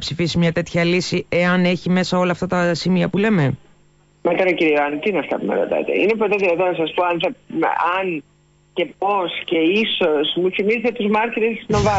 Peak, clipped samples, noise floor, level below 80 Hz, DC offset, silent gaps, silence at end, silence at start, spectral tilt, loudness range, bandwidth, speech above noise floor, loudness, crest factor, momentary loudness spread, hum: -8 dBFS; under 0.1%; -54 dBFS; -46 dBFS; under 0.1%; none; 0 s; 0 s; -6 dB/octave; 2 LU; 8 kHz; 36 dB; -19 LUFS; 12 dB; 5 LU; none